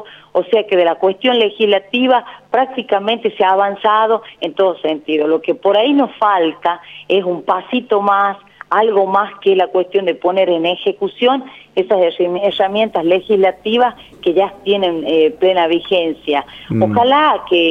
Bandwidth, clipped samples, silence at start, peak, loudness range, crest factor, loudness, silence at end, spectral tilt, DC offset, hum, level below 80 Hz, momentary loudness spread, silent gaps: 6 kHz; under 0.1%; 0 s; 0 dBFS; 1 LU; 14 dB; -15 LUFS; 0 s; -7 dB/octave; under 0.1%; none; -58 dBFS; 6 LU; none